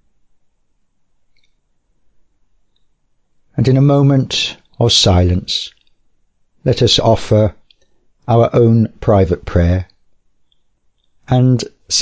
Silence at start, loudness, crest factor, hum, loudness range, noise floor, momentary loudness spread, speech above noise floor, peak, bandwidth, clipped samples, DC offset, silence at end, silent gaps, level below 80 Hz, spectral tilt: 3.55 s; -13 LUFS; 14 dB; none; 3 LU; -60 dBFS; 10 LU; 48 dB; -2 dBFS; 8 kHz; under 0.1%; under 0.1%; 0 s; none; -30 dBFS; -5.5 dB/octave